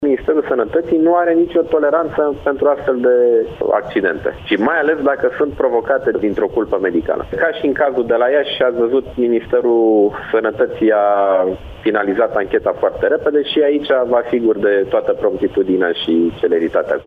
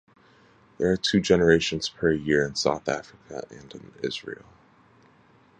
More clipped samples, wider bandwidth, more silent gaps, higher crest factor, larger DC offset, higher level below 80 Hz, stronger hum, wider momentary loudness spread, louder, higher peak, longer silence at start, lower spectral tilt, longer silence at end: neither; second, 4.8 kHz vs 9.6 kHz; neither; second, 14 dB vs 22 dB; neither; first, -44 dBFS vs -52 dBFS; neither; second, 4 LU vs 21 LU; first, -16 LUFS vs -24 LUFS; about the same, -2 dBFS vs -4 dBFS; second, 0 s vs 0.8 s; first, -7.5 dB/octave vs -4.5 dB/octave; second, 0.05 s vs 1.25 s